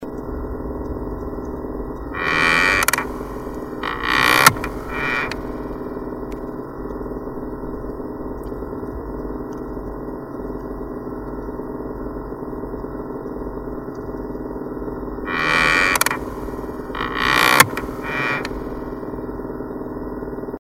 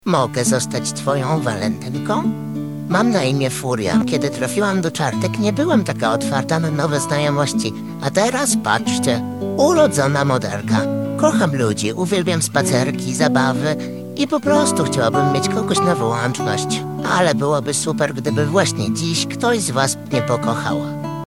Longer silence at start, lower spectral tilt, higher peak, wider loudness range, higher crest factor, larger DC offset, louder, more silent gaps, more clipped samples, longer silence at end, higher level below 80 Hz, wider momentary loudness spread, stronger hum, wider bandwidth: about the same, 0 s vs 0.05 s; second, -3 dB/octave vs -5 dB/octave; about the same, 0 dBFS vs -2 dBFS; first, 12 LU vs 2 LU; first, 24 dB vs 16 dB; second, under 0.1% vs 0.3%; second, -22 LUFS vs -18 LUFS; neither; neither; about the same, 0 s vs 0 s; first, -36 dBFS vs -60 dBFS; first, 16 LU vs 6 LU; neither; about the same, 16 kHz vs 16.5 kHz